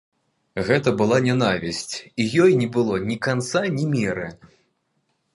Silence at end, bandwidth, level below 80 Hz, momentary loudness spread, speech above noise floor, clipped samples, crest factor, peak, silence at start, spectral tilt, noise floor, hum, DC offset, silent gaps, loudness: 1 s; 11.5 kHz; -54 dBFS; 11 LU; 50 dB; under 0.1%; 18 dB; -4 dBFS; 0.55 s; -5.5 dB/octave; -71 dBFS; none; under 0.1%; none; -21 LUFS